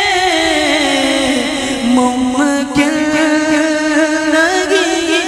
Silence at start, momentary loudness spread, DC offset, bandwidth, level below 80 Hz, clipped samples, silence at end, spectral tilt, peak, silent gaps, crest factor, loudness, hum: 0 s; 2 LU; under 0.1%; 15 kHz; -42 dBFS; under 0.1%; 0 s; -2.5 dB/octave; 0 dBFS; none; 12 dB; -12 LUFS; none